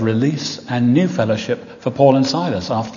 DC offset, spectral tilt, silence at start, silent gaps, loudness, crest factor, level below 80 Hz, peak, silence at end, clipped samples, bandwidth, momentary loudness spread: under 0.1%; -6.5 dB/octave; 0 s; none; -17 LUFS; 16 dB; -56 dBFS; 0 dBFS; 0 s; under 0.1%; 7.4 kHz; 10 LU